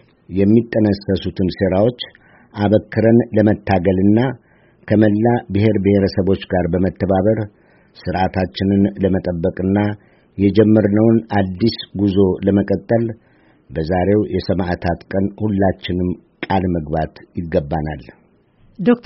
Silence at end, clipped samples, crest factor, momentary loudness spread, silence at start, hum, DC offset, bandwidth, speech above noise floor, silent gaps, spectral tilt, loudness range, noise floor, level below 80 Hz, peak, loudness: 0.05 s; under 0.1%; 16 dB; 11 LU; 0.3 s; none; under 0.1%; 5.8 kHz; 37 dB; none; -7 dB/octave; 4 LU; -53 dBFS; -42 dBFS; 0 dBFS; -17 LUFS